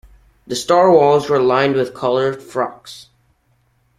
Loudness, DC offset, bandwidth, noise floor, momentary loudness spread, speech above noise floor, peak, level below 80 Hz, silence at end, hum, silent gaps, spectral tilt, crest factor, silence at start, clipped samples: -16 LUFS; under 0.1%; 14 kHz; -61 dBFS; 14 LU; 45 dB; 0 dBFS; -54 dBFS; 1 s; none; none; -5 dB/octave; 16 dB; 0.5 s; under 0.1%